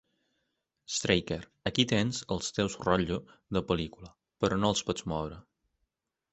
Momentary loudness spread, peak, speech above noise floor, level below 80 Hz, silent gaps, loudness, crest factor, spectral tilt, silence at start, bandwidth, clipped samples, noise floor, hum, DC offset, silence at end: 9 LU; -8 dBFS; 52 dB; -52 dBFS; none; -31 LUFS; 24 dB; -4.5 dB/octave; 0.9 s; 8.4 kHz; under 0.1%; -83 dBFS; none; under 0.1%; 0.9 s